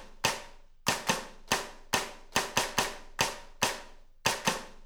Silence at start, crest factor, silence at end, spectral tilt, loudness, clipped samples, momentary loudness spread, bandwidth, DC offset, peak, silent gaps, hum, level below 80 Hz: 0 s; 24 dB; 0 s; -1.5 dB/octave; -31 LUFS; under 0.1%; 5 LU; over 20 kHz; under 0.1%; -8 dBFS; none; none; -52 dBFS